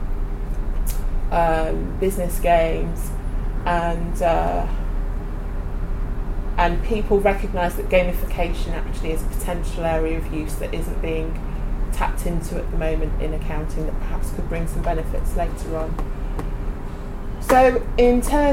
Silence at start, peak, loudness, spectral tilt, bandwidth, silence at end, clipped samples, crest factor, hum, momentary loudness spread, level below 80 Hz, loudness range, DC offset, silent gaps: 0 s; -4 dBFS; -24 LUFS; -6 dB/octave; 15.5 kHz; 0 s; under 0.1%; 16 dB; none; 12 LU; -24 dBFS; 5 LU; under 0.1%; none